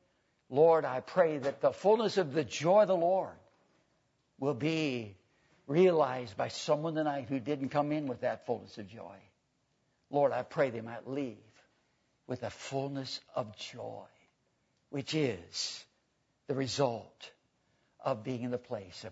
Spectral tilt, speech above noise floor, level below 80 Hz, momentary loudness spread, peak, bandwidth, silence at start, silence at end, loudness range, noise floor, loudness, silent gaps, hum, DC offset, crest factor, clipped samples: -5.5 dB/octave; 45 dB; -78 dBFS; 17 LU; -14 dBFS; 8 kHz; 0.5 s; 0 s; 9 LU; -77 dBFS; -32 LUFS; none; none; under 0.1%; 20 dB; under 0.1%